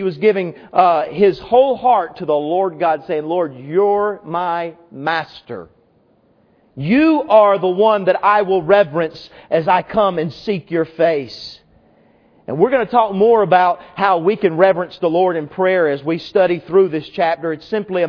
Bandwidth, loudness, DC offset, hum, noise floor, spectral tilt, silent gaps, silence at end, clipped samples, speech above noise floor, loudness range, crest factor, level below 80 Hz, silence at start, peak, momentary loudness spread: 5.4 kHz; -16 LUFS; under 0.1%; none; -56 dBFS; -8 dB/octave; none; 0 s; under 0.1%; 40 dB; 5 LU; 16 dB; -56 dBFS; 0 s; 0 dBFS; 9 LU